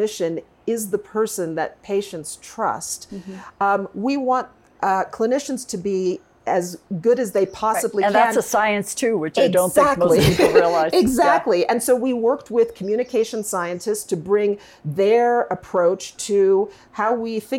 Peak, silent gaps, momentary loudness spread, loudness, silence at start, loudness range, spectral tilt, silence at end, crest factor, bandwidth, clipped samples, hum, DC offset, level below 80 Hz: 0 dBFS; none; 11 LU; -20 LUFS; 0 s; 7 LU; -4.5 dB/octave; 0 s; 20 dB; 17 kHz; under 0.1%; none; under 0.1%; -50 dBFS